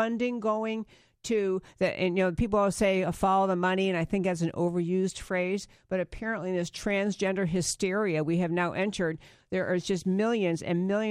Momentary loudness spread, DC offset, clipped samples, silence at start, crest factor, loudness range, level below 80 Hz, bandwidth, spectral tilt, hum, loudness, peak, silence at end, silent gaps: 7 LU; under 0.1%; under 0.1%; 0 s; 16 dB; 3 LU; -52 dBFS; 14 kHz; -5.5 dB/octave; none; -29 LUFS; -12 dBFS; 0 s; none